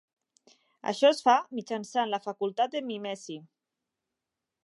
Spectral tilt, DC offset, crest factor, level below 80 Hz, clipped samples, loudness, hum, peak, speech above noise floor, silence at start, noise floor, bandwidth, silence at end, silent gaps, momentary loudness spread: -3.5 dB/octave; under 0.1%; 20 dB; -88 dBFS; under 0.1%; -28 LUFS; none; -10 dBFS; 59 dB; 0.85 s; -88 dBFS; 11.5 kHz; 1.2 s; none; 15 LU